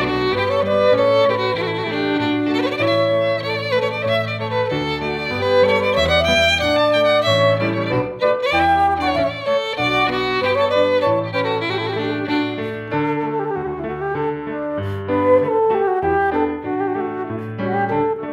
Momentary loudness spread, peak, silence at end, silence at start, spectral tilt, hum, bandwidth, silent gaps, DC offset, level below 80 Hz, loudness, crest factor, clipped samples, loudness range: 9 LU; -4 dBFS; 0 s; 0 s; -5.5 dB/octave; none; 14 kHz; none; under 0.1%; -44 dBFS; -18 LUFS; 14 dB; under 0.1%; 5 LU